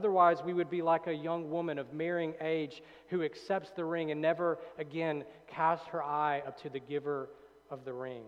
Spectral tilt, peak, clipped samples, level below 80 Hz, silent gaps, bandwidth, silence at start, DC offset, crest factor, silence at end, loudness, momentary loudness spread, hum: -7.5 dB/octave; -14 dBFS; under 0.1%; -78 dBFS; none; 8.6 kHz; 0 s; under 0.1%; 20 dB; 0 s; -34 LUFS; 11 LU; none